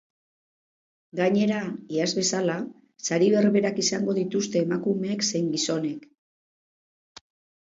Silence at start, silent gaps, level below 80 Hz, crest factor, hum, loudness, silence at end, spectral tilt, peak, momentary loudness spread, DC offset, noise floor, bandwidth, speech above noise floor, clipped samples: 1.15 s; none; -72 dBFS; 16 dB; none; -25 LUFS; 1.75 s; -4.5 dB/octave; -10 dBFS; 11 LU; under 0.1%; under -90 dBFS; 7.8 kHz; over 66 dB; under 0.1%